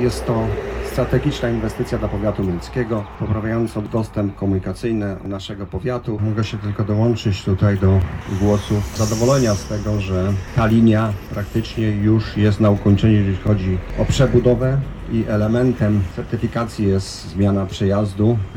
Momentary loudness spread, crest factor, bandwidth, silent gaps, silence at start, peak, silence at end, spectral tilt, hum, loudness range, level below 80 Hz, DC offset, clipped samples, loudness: 8 LU; 16 dB; 15 kHz; none; 0 s; -2 dBFS; 0 s; -7 dB/octave; none; 5 LU; -34 dBFS; under 0.1%; under 0.1%; -19 LUFS